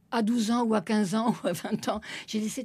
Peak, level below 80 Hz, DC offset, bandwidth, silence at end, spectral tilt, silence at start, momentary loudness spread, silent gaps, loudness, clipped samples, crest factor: -14 dBFS; -64 dBFS; under 0.1%; 14.5 kHz; 0 s; -5 dB/octave; 0.1 s; 7 LU; none; -28 LUFS; under 0.1%; 14 dB